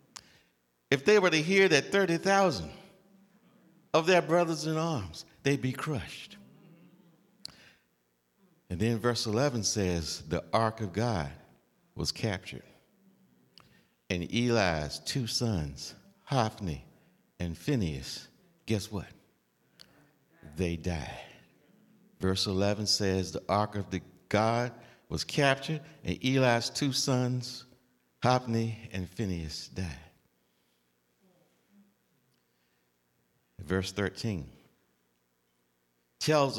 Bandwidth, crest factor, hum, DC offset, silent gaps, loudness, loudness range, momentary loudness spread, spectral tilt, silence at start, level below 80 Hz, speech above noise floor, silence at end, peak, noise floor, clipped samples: 16.5 kHz; 24 dB; 60 Hz at -60 dBFS; under 0.1%; none; -30 LUFS; 11 LU; 18 LU; -4.5 dB/octave; 0.15 s; -58 dBFS; 45 dB; 0 s; -10 dBFS; -74 dBFS; under 0.1%